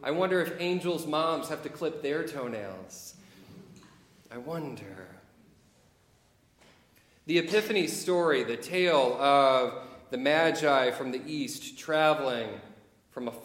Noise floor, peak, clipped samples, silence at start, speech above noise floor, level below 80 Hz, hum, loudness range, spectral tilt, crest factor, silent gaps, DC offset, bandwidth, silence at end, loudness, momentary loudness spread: -65 dBFS; -10 dBFS; under 0.1%; 0 s; 36 dB; -72 dBFS; none; 19 LU; -4.5 dB/octave; 20 dB; none; under 0.1%; 17 kHz; 0 s; -28 LUFS; 19 LU